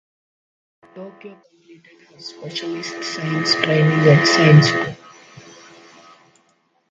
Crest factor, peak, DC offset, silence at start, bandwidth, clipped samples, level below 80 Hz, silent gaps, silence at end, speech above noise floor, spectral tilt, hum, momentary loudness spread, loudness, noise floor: 20 dB; 0 dBFS; under 0.1%; 0.95 s; 7.8 kHz; under 0.1%; -60 dBFS; none; 1.95 s; 45 dB; -5.5 dB/octave; none; 26 LU; -16 LUFS; -63 dBFS